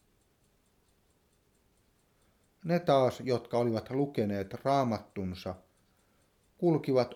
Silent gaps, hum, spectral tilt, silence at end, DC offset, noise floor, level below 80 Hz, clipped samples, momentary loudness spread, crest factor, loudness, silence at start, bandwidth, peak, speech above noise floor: none; none; -7.5 dB/octave; 0 s; under 0.1%; -70 dBFS; -68 dBFS; under 0.1%; 13 LU; 20 dB; -31 LUFS; 2.65 s; 16 kHz; -12 dBFS; 40 dB